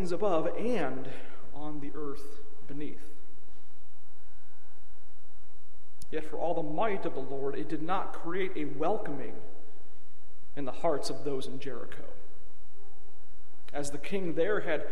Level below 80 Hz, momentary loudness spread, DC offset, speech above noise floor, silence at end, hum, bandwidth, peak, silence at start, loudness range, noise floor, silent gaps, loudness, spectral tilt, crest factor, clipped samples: -60 dBFS; 18 LU; 8%; 27 dB; 0 s; none; 14.5 kHz; -14 dBFS; 0 s; 13 LU; -62 dBFS; none; -35 LUFS; -6 dB/octave; 20 dB; under 0.1%